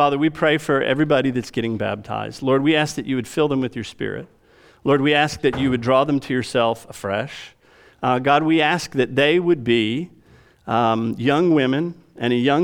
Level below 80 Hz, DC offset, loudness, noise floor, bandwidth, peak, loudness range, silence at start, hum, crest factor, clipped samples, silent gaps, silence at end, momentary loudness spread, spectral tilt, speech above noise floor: -54 dBFS; under 0.1%; -20 LUFS; -51 dBFS; 16 kHz; -4 dBFS; 2 LU; 0 s; none; 16 dB; under 0.1%; none; 0 s; 11 LU; -6 dB/octave; 32 dB